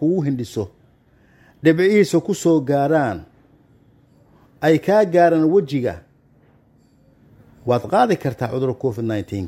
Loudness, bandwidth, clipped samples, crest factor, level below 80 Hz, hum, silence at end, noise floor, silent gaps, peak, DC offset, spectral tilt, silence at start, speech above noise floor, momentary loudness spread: -18 LUFS; 15.5 kHz; under 0.1%; 18 dB; -56 dBFS; none; 0 s; -55 dBFS; none; -2 dBFS; under 0.1%; -7 dB/octave; 0 s; 37 dB; 12 LU